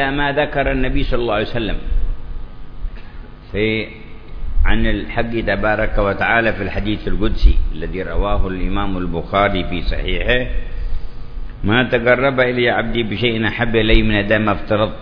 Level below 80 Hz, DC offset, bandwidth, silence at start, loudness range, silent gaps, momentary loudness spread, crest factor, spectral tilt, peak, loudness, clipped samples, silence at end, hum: -22 dBFS; under 0.1%; 5.4 kHz; 0 s; 7 LU; none; 19 LU; 16 dB; -8.5 dB/octave; 0 dBFS; -18 LUFS; under 0.1%; 0 s; none